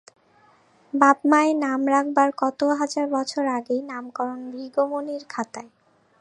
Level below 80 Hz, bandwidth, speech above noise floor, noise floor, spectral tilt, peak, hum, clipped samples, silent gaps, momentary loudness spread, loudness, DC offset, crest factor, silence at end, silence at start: -78 dBFS; 10.5 kHz; 35 dB; -58 dBFS; -3.5 dB/octave; -2 dBFS; none; under 0.1%; none; 13 LU; -23 LUFS; under 0.1%; 22 dB; 0.55 s; 0.95 s